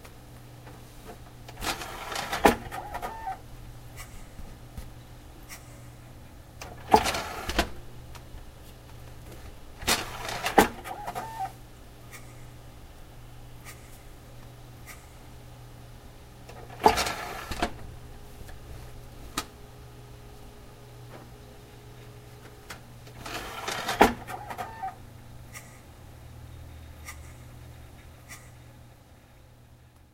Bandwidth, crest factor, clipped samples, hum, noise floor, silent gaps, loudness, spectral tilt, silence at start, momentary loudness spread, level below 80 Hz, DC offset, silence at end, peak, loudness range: 16 kHz; 34 dB; under 0.1%; none; -54 dBFS; none; -29 LUFS; -3.5 dB/octave; 0 s; 25 LU; -46 dBFS; under 0.1%; 0 s; 0 dBFS; 18 LU